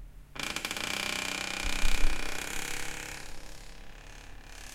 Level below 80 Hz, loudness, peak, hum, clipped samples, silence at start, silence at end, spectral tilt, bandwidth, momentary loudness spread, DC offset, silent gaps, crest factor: -34 dBFS; -34 LUFS; -10 dBFS; none; under 0.1%; 0 s; 0 s; -1.5 dB/octave; 16 kHz; 18 LU; under 0.1%; none; 20 dB